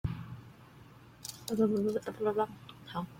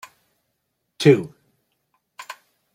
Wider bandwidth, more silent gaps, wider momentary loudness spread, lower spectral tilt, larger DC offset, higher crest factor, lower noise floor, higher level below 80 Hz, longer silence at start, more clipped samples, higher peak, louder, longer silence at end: about the same, 16.5 kHz vs 15 kHz; neither; about the same, 25 LU vs 25 LU; about the same, -6.5 dB/octave vs -6.5 dB/octave; neither; about the same, 18 dB vs 22 dB; second, -55 dBFS vs -75 dBFS; first, -58 dBFS vs -66 dBFS; second, 0.05 s vs 1 s; neither; second, -18 dBFS vs -2 dBFS; second, -34 LUFS vs -18 LUFS; second, 0 s vs 0.4 s